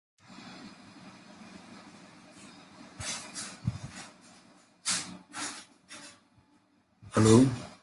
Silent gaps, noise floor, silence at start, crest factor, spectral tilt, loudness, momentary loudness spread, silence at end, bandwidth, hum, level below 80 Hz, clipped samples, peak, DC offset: none; -67 dBFS; 0.4 s; 26 dB; -5 dB/octave; -29 LUFS; 28 LU; 0.1 s; 11.5 kHz; none; -58 dBFS; under 0.1%; -8 dBFS; under 0.1%